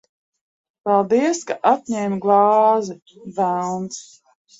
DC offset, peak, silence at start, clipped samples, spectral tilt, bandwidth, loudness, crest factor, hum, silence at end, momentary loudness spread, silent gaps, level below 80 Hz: under 0.1%; -2 dBFS; 0.85 s; under 0.1%; -5.5 dB/octave; 8 kHz; -19 LUFS; 18 dB; none; 0.55 s; 17 LU; none; -68 dBFS